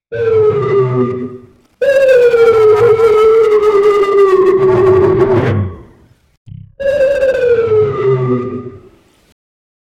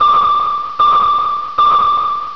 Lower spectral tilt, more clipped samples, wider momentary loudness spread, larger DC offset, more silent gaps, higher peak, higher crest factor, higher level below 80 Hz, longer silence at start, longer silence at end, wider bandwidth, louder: first, -7.5 dB/octave vs -3.5 dB/octave; neither; first, 10 LU vs 6 LU; second, under 0.1% vs 1%; first, 6.37-6.45 s vs none; about the same, -2 dBFS vs -2 dBFS; about the same, 10 dB vs 10 dB; about the same, -42 dBFS vs -46 dBFS; about the same, 0.1 s vs 0 s; first, 1.2 s vs 0 s; first, 9.8 kHz vs 5.4 kHz; about the same, -10 LUFS vs -12 LUFS